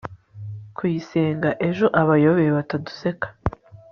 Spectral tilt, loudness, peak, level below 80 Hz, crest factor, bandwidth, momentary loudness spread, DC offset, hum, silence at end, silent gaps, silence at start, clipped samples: -7 dB/octave; -21 LUFS; -2 dBFS; -48 dBFS; 20 dB; 6.6 kHz; 19 LU; under 0.1%; none; 0.15 s; none; 0.05 s; under 0.1%